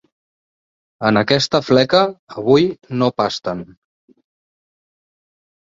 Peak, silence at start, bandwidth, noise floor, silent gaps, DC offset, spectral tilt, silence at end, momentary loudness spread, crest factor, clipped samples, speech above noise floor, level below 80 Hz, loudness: -2 dBFS; 1 s; 7.8 kHz; under -90 dBFS; 2.19-2.27 s; under 0.1%; -5.5 dB/octave; 1.95 s; 10 LU; 18 dB; under 0.1%; over 74 dB; -54 dBFS; -17 LUFS